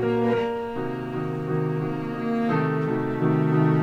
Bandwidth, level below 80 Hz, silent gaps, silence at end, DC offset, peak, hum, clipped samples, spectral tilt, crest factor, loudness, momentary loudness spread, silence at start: 6.4 kHz; -54 dBFS; none; 0 s; under 0.1%; -10 dBFS; none; under 0.1%; -9.5 dB/octave; 14 dB; -25 LUFS; 8 LU; 0 s